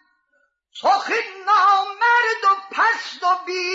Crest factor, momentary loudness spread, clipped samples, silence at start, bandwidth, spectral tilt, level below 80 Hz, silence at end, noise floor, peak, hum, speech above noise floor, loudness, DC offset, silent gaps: 14 dB; 7 LU; under 0.1%; 0.75 s; 7.8 kHz; 0 dB/octave; -86 dBFS; 0 s; -66 dBFS; -6 dBFS; none; 46 dB; -18 LUFS; under 0.1%; none